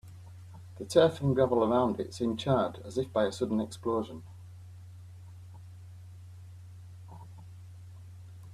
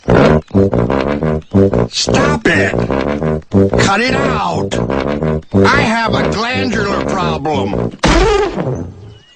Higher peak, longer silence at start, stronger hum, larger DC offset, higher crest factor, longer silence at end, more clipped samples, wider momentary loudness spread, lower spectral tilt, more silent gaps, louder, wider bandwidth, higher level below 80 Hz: second, -10 dBFS vs 0 dBFS; about the same, 0.05 s vs 0.05 s; neither; neither; first, 22 dB vs 12 dB; second, 0 s vs 0.2 s; neither; first, 24 LU vs 6 LU; about the same, -6.5 dB/octave vs -5.5 dB/octave; neither; second, -29 LUFS vs -13 LUFS; first, 13.5 kHz vs 9.6 kHz; second, -64 dBFS vs -26 dBFS